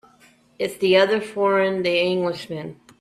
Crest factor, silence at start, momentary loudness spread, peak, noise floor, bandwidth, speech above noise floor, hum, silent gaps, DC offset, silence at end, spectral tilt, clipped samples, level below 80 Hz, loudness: 18 dB; 0.6 s; 15 LU; -4 dBFS; -55 dBFS; 14.5 kHz; 35 dB; none; none; under 0.1%; 0.3 s; -5 dB/octave; under 0.1%; -64 dBFS; -21 LUFS